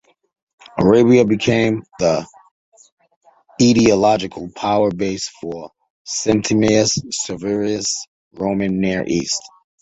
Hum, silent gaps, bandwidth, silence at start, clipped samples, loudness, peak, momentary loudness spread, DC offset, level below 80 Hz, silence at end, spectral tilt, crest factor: none; 2.51-2.72 s, 2.92-2.97 s, 3.16-3.21 s, 5.90-6.05 s, 8.08-8.31 s; 8.4 kHz; 0.75 s; under 0.1%; -17 LUFS; 0 dBFS; 13 LU; under 0.1%; -48 dBFS; 0.35 s; -4.5 dB/octave; 18 dB